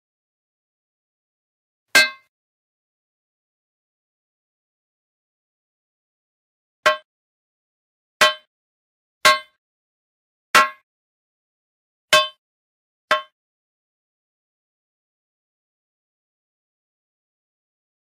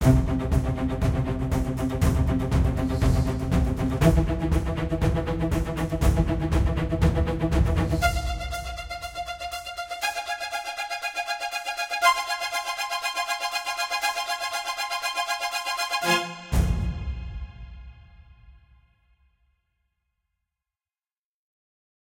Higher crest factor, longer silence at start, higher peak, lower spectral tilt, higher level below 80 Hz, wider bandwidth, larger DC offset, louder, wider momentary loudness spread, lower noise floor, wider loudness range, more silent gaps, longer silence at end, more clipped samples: about the same, 24 dB vs 20 dB; first, 1.95 s vs 0 s; first, -2 dBFS vs -6 dBFS; second, 0.5 dB/octave vs -5 dB/octave; second, -72 dBFS vs -32 dBFS; about the same, 16 kHz vs 16.5 kHz; neither; first, -18 LUFS vs -26 LUFS; about the same, 8 LU vs 10 LU; about the same, under -90 dBFS vs under -90 dBFS; first, 9 LU vs 6 LU; first, 2.28-6.83 s, 7.05-8.20 s, 8.47-9.21 s, 9.58-10.54 s, 10.83-12.08 s, 12.38-13.08 s vs none; first, 4.85 s vs 3.5 s; neither